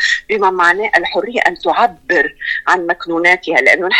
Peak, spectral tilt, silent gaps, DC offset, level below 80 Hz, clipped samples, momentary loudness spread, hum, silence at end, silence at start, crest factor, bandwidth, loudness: 0 dBFS; -3 dB/octave; none; under 0.1%; -50 dBFS; under 0.1%; 5 LU; none; 0 s; 0 s; 14 dB; 14.5 kHz; -13 LUFS